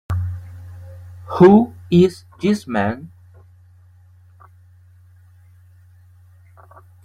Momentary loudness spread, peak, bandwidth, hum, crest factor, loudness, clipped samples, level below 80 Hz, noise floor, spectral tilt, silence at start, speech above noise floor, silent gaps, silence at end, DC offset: 27 LU; -2 dBFS; 11 kHz; none; 18 dB; -16 LUFS; under 0.1%; -52 dBFS; -49 dBFS; -8 dB/octave; 0.1 s; 34 dB; none; 4 s; under 0.1%